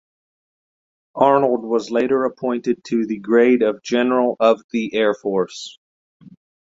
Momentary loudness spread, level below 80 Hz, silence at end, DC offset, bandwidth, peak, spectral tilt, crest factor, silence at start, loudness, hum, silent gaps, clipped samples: 8 LU; -64 dBFS; 0.35 s; under 0.1%; 7.8 kHz; -2 dBFS; -5.5 dB/octave; 18 dB; 1.15 s; -19 LUFS; none; 4.64-4.69 s, 5.78-6.20 s; under 0.1%